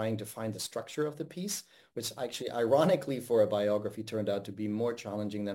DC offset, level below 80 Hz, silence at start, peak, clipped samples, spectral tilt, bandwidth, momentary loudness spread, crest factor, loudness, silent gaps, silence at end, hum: under 0.1%; -76 dBFS; 0 s; -12 dBFS; under 0.1%; -5 dB/octave; 16.5 kHz; 11 LU; 20 dB; -32 LUFS; none; 0 s; none